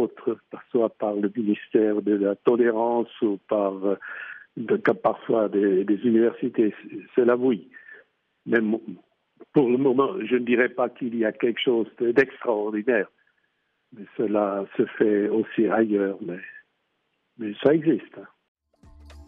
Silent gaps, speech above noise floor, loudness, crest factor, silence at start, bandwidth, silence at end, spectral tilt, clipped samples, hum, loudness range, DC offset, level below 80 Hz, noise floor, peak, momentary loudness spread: 18.48-18.55 s; 51 dB; -24 LUFS; 18 dB; 0 s; 4.2 kHz; 0.05 s; -5 dB/octave; under 0.1%; none; 3 LU; under 0.1%; -64 dBFS; -74 dBFS; -6 dBFS; 13 LU